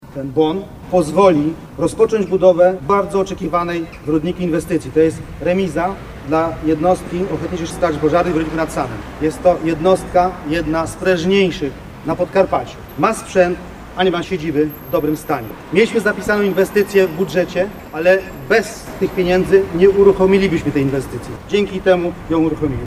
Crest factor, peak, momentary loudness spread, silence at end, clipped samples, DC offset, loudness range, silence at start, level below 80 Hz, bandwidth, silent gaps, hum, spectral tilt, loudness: 16 dB; 0 dBFS; 9 LU; 0 s; under 0.1%; under 0.1%; 4 LU; 0.05 s; -38 dBFS; 15 kHz; none; none; -6 dB/octave; -17 LUFS